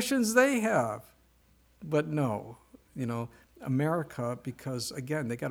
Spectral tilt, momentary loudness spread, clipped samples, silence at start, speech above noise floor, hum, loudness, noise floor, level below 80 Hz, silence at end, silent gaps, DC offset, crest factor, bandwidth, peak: -5 dB/octave; 18 LU; under 0.1%; 0 s; 34 dB; none; -30 LUFS; -64 dBFS; -66 dBFS; 0 s; none; under 0.1%; 20 dB; over 20 kHz; -10 dBFS